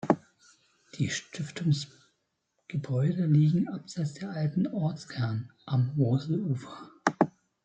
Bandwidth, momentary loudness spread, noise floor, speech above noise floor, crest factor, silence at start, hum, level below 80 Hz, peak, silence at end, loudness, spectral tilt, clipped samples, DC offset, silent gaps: 8.6 kHz; 12 LU; -78 dBFS; 50 dB; 26 dB; 0.05 s; none; -70 dBFS; -4 dBFS; 0.35 s; -30 LUFS; -7 dB/octave; under 0.1%; under 0.1%; none